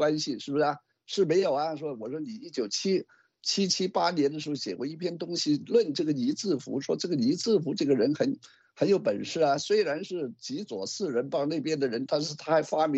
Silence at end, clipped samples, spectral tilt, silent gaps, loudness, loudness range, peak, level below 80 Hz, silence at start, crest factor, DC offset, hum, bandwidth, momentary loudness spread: 0 s; under 0.1%; -4.5 dB/octave; none; -28 LUFS; 2 LU; -12 dBFS; -76 dBFS; 0 s; 16 dB; under 0.1%; none; 8.4 kHz; 10 LU